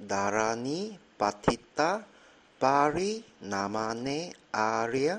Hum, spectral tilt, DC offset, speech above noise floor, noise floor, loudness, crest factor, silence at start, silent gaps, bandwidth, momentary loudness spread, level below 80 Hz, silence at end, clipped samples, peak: none; -4.5 dB/octave; under 0.1%; 24 dB; -54 dBFS; -30 LUFS; 20 dB; 0 s; none; 10.5 kHz; 10 LU; -58 dBFS; 0 s; under 0.1%; -10 dBFS